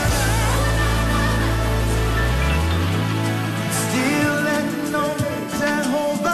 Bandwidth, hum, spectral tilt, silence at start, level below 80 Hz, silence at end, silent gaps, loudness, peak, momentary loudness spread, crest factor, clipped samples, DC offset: 14 kHz; none; -5 dB/octave; 0 s; -26 dBFS; 0 s; none; -20 LUFS; -8 dBFS; 3 LU; 12 dB; under 0.1%; under 0.1%